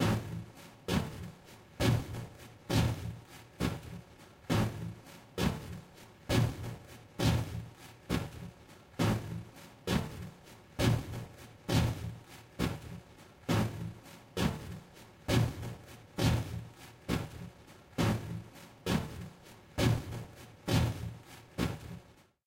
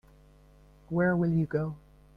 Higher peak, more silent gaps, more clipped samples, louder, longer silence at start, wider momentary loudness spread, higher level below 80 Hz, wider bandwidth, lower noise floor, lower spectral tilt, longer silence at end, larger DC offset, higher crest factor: about the same, -14 dBFS vs -16 dBFS; neither; neither; second, -35 LUFS vs -29 LUFS; second, 0 s vs 0.9 s; first, 19 LU vs 11 LU; first, -48 dBFS vs -56 dBFS; first, 16 kHz vs 5 kHz; about the same, -57 dBFS vs -57 dBFS; second, -5.5 dB/octave vs -11 dB/octave; about the same, 0.35 s vs 0.4 s; neither; first, 20 dB vs 14 dB